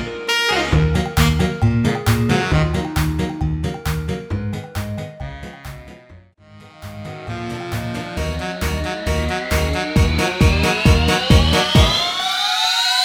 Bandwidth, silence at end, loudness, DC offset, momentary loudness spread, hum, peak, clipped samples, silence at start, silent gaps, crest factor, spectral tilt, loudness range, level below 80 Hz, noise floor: 17.5 kHz; 0 s; -18 LUFS; under 0.1%; 17 LU; none; 0 dBFS; under 0.1%; 0 s; none; 18 dB; -5 dB/octave; 14 LU; -26 dBFS; -45 dBFS